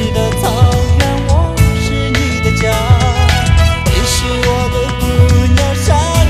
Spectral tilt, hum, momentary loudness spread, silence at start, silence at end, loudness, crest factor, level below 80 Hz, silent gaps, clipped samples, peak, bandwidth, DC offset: -5 dB/octave; none; 4 LU; 0 s; 0 s; -12 LUFS; 10 dB; -16 dBFS; none; 0.2%; 0 dBFS; 15 kHz; 0.3%